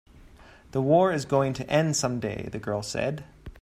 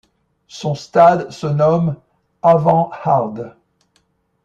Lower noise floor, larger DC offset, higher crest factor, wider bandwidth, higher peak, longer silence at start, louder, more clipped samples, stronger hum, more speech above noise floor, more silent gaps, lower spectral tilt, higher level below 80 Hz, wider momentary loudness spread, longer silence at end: second, -51 dBFS vs -63 dBFS; neither; about the same, 20 dB vs 16 dB; first, 15.5 kHz vs 8 kHz; second, -8 dBFS vs -2 dBFS; second, 0.15 s vs 0.55 s; second, -26 LUFS vs -16 LUFS; neither; neither; second, 26 dB vs 48 dB; neither; second, -5 dB/octave vs -7.5 dB/octave; about the same, -52 dBFS vs -56 dBFS; about the same, 12 LU vs 14 LU; second, 0 s vs 0.95 s